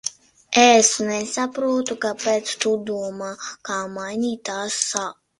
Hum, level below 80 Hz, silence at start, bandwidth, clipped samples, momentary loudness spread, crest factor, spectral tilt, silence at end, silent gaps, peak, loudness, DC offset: none; -64 dBFS; 0.05 s; 11.5 kHz; under 0.1%; 14 LU; 20 dB; -2 dB/octave; 0.3 s; none; 0 dBFS; -21 LUFS; under 0.1%